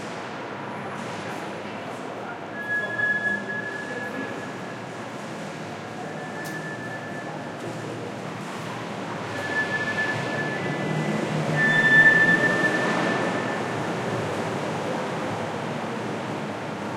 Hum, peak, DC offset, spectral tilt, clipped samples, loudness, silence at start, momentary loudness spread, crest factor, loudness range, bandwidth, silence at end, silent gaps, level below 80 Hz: none; -6 dBFS; under 0.1%; -5 dB/octave; under 0.1%; -25 LUFS; 0 s; 14 LU; 20 dB; 13 LU; 15.5 kHz; 0 s; none; -66 dBFS